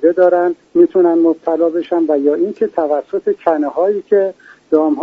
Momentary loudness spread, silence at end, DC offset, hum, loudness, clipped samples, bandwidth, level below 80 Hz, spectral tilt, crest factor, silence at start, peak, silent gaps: 6 LU; 0 s; under 0.1%; none; -15 LUFS; under 0.1%; 4.3 kHz; -64 dBFS; -6 dB/octave; 14 dB; 0 s; 0 dBFS; none